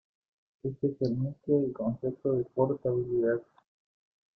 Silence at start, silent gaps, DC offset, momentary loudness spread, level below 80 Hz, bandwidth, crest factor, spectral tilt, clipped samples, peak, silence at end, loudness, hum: 0.65 s; none; under 0.1%; 5 LU; -64 dBFS; 6 kHz; 18 dB; -11 dB/octave; under 0.1%; -14 dBFS; 0.95 s; -31 LUFS; none